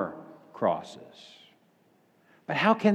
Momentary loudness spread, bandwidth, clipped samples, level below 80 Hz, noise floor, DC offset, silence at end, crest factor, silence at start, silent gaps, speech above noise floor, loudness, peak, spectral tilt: 25 LU; 9 kHz; under 0.1%; -80 dBFS; -65 dBFS; under 0.1%; 0 s; 20 dB; 0 s; none; 38 dB; -28 LUFS; -10 dBFS; -6.5 dB/octave